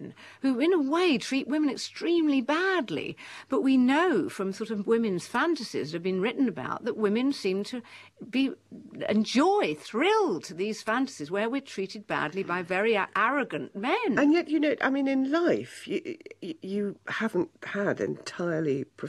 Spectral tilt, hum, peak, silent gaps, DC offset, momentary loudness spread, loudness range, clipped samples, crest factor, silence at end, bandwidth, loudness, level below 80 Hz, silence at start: -5 dB/octave; none; -12 dBFS; none; under 0.1%; 10 LU; 3 LU; under 0.1%; 16 dB; 0 s; 12.5 kHz; -28 LUFS; -74 dBFS; 0 s